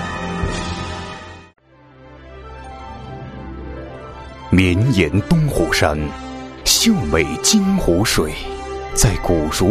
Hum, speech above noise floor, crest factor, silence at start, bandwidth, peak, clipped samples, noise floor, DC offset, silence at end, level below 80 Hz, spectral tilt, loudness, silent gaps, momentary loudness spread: none; 30 dB; 18 dB; 0 s; 15.5 kHz; -2 dBFS; under 0.1%; -45 dBFS; under 0.1%; 0 s; -30 dBFS; -4 dB/octave; -17 LUFS; none; 20 LU